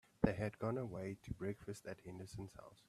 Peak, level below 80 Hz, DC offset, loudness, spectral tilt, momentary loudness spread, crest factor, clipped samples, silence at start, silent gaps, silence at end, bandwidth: -18 dBFS; -60 dBFS; under 0.1%; -45 LUFS; -7.5 dB/octave; 13 LU; 26 dB; under 0.1%; 0.2 s; none; 0.15 s; 14 kHz